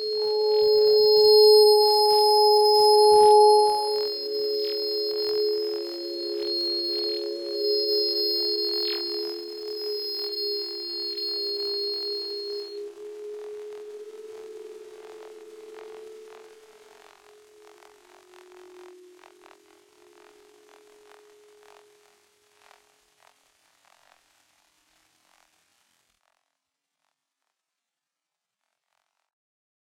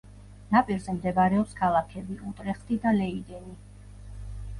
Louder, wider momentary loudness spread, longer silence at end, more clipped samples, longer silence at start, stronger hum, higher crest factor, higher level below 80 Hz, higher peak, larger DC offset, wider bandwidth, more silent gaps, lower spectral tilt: first, -21 LUFS vs -27 LUFS; first, 26 LU vs 20 LU; first, 10.95 s vs 0 s; neither; about the same, 0 s vs 0.05 s; second, none vs 50 Hz at -45 dBFS; about the same, 20 dB vs 20 dB; second, -72 dBFS vs -46 dBFS; about the same, -6 dBFS vs -8 dBFS; neither; first, 16.5 kHz vs 11.5 kHz; neither; second, -1.5 dB/octave vs -7.5 dB/octave